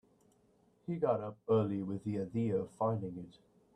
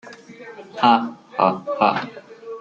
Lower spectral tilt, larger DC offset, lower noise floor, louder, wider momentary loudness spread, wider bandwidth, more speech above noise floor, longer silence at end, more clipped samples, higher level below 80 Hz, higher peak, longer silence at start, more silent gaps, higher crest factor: first, -9.5 dB/octave vs -6 dB/octave; neither; first, -70 dBFS vs -40 dBFS; second, -36 LUFS vs -20 LUFS; second, 14 LU vs 23 LU; first, 9.6 kHz vs 7.6 kHz; first, 35 dB vs 21 dB; first, 0.45 s vs 0 s; neither; about the same, -72 dBFS vs -68 dBFS; second, -18 dBFS vs -2 dBFS; first, 0.9 s vs 0.05 s; neither; about the same, 18 dB vs 20 dB